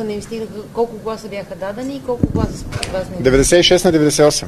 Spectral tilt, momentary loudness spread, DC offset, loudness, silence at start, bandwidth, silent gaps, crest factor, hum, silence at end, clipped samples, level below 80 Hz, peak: -4 dB/octave; 16 LU; under 0.1%; -16 LUFS; 0 s; 13.5 kHz; none; 16 dB; none; 0 s; under 0.1%; -32 dBFS; 0 dBFS